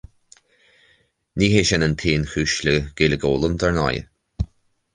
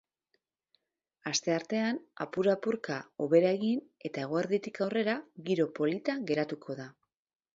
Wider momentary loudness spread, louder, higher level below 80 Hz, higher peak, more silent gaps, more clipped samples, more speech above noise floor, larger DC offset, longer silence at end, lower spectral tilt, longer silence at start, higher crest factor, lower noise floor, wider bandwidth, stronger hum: first, 14 LU vs 11 LU; first, -20 LUFS vs -32 LUFS; first, -36 dBFS vs -78 dBFS; first, -2 dBFS vs -12 dBFS; neither; neither; second, 42 dB vs 49 dB; neither; second, 0.5 s vs 0.65 s; about the same, -5 dB/octave vs -5 dB/octave; about the same, 1.35 s vs 1.25 s; about the same, 20 dB vs 20 dB; second, -61 dBFS vs -80 dBFS; first, 10 kHz vs 7.8 kHz; neither